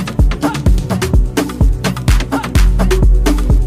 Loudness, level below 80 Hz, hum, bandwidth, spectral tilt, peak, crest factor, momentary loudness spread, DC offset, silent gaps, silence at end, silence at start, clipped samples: -14 LUFS; -12 dBFS; none; 15 kHz; -6 dB/octave; -2 dBFS; 10 dB; 3 LU; under 0.1%; none; 0 s; 0 s; under 0.1%